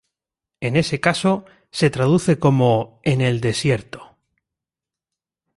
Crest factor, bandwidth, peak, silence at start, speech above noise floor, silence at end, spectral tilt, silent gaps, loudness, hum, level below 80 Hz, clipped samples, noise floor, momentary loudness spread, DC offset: 18 dB; 11.5 kHz; -2 dBFS; 0.6 s; 70 dB; 1.55 s; -6 dB/octave; none; -19 LUFS; none; -52 dBFS; under 0.1%; -88 dBFS; 10 LU; under 0.1%